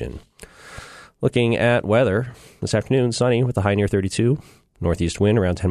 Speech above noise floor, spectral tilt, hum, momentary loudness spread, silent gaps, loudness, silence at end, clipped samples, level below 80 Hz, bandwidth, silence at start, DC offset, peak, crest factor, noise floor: 21 dB; -6.5 dB/octave; none; 16 LU; none; -20 LUFS; 0 s; under 0.1%; -42 dBFS; 12.5 kHz; 0 s; under 0.1%; -4 dBFS; 16 dB; -41 dBFS